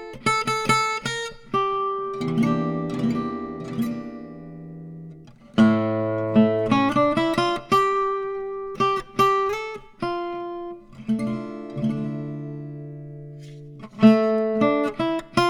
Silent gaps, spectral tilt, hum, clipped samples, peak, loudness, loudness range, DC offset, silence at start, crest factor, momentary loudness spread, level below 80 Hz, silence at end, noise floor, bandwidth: none; -6 dB/octave; none; under 0.1%; -4 dBFS; -23 LUFS; 9 LU; under 0.1%; 0 s; 20 dB; 20 LU; -54 dBFS; 0 s; -44 dBFS; 12.5 kHz